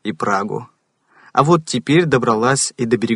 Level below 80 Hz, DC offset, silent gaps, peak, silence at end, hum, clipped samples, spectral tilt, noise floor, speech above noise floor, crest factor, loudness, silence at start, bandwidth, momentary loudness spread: -54 dBFS; under 0.1%; none; 0 dBFS; 0 s; none; under 0.1%; -5 dB/octave; -55 dBFS; 38 dB; 18 dB; -17 LUFS; 0.05 s; 11 kHz; 6 LU